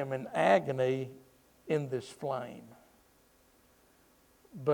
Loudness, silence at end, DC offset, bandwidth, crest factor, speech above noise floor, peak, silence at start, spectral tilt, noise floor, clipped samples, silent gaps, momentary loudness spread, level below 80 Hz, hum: -32 LUFS; 0 s; under 0.1%; 19.5 kHz; 20 dB; 34 dB; -14 dBFS; 0 s; -6.5 dB/octave; -66 dBFS; under 0.1%; none; 22 LU; -74 dBFS; none